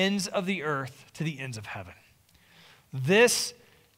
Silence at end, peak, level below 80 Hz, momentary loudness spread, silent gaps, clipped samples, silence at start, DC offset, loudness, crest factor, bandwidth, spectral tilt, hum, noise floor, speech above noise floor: 0.45 s; -8 dBFS; -68 dBFS; 20 LU; none; under 0.1%; 0 s; under 0.1%; -27 LUFS; 20 dB; 16 kHz; -3.5 dB/octave; none; -61 dBFS; 33 dB